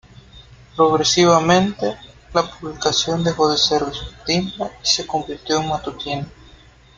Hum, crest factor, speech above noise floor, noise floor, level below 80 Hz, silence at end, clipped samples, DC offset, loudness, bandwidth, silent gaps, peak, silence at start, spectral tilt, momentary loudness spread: none; 18 dB; 28 dB; -47 dBFS; -46 dBFS; 0.65 s; under 0.1%; under 0.1%; -19 LUFS; 9.2 kHz; none; 0 dBFS; 0.35 s; -4 dB/octave; 13 LU